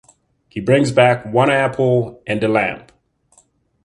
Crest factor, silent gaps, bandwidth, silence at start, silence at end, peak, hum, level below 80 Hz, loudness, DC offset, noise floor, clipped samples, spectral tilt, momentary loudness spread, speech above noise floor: 18 dB; none; 11 kHz; 0.55 s; 1.05 s; 0 dBFS; none; -54 dBFS; -16 LUFS; under 0.1%; -57 dBFS; under 0.1%; -6.5 dB/octave; 11 LU; 41 dB